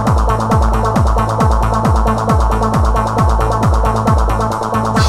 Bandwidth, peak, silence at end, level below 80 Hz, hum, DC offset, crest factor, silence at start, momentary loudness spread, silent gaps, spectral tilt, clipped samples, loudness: 14 kHz; 0 dBFS; 0 s; -16 dBFS; none; under 0.1%; 12 dB; 0 s; 1 LU; none; -7 dB/octave; under 0.1%; -14 LUFS